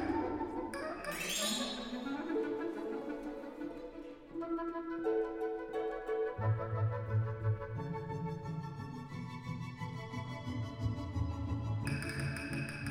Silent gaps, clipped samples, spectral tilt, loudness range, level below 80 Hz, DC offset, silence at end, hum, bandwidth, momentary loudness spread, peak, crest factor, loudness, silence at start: none; under 0.1%; -5.5 dB/octave; 5 LU; -56 dBFS; under 0.1%; 0 s; none; 16 kHz; 9 LU; -22 dBFS; 16 dB; -39 LUFS; 0 s